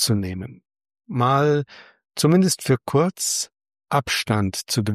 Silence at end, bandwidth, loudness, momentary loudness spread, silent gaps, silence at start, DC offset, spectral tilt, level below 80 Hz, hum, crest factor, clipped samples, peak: 0 s; 15.5 kHz; -21 LUFS; 14 LU; none; 0 s; under 0.1%; -4.5 dB/octave; -58 dBFS; none; 16 dB; under 0.1%; -6 dBFS